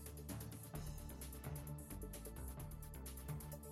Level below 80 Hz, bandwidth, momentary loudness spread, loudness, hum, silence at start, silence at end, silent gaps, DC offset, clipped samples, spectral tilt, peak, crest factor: -54 dBFS; 16 kHz; 2 LU; -51 LUFS; none; 0 s; 0 s; none; under 0.1%; under 0.1%; -5.5 dB/octave; -34 dBFS; 14 dB